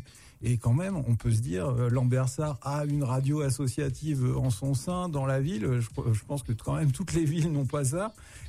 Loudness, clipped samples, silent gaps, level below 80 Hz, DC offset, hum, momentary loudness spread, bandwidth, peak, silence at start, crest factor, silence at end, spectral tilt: -29 LUFS; under 0.1%; none; -48 dBFS; under 0.1%; none; 5 LU; 14 kHz; -16 dBFS; 0 s; 12 dB; 0 s; -7 dB/octave